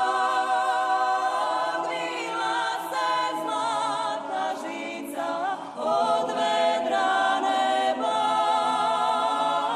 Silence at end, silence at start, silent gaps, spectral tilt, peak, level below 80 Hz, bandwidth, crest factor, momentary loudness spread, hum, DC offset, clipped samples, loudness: 0 s; 0 s; none; -2.5 dB/octave; -12 dBFS; -74 dBFS; 13 kHz; 12 dB; 6 LU; none; under 0.1%; under 0.1%; -25 LUFS